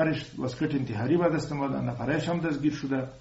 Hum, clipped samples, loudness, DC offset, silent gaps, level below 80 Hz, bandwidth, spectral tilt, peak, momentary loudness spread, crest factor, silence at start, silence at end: none; under 0.1%; -29 LUFS; under 0.1%; none; -56 dBFS; 8 kHz; -6.5 dB/octave; -12 dBFS; 6 LU; 16 dB; 0 s; 0 s